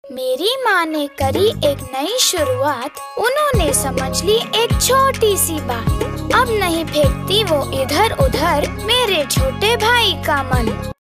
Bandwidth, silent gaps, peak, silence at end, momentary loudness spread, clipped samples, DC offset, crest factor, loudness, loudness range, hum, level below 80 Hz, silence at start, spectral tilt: 16 kHz; none; -2 dBFS; 0.1 s; 7 LU; under 0.1%; under 0.1%; 14 dB; -16 LUFS; 2 LU; none; -30 dBFS; 0.05 s; -3.5 dB/octave